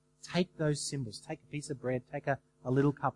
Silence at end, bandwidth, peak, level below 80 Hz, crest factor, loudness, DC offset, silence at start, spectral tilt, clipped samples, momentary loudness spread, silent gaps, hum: 0.05 s; 11.5 kHz; -16 dBFS; -66 dBFS; 18 dB; -35 LUFS; under 0.1%; 0.25 s; -5.5 dB/octave; under 0.1%; 11 LU; none; none